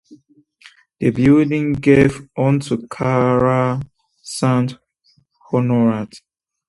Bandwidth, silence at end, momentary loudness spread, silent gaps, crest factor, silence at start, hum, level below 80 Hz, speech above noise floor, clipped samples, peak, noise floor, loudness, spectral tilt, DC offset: 11.5 kHz; 0.5 s; 12 LU; none; 18 dB; 0.1 s; none; -46 dBFS; 44 dB; under 0.1%; 0 dBFS; -60 dBFS; -17 LUFS; -7.5 dB/octave; under 0.1%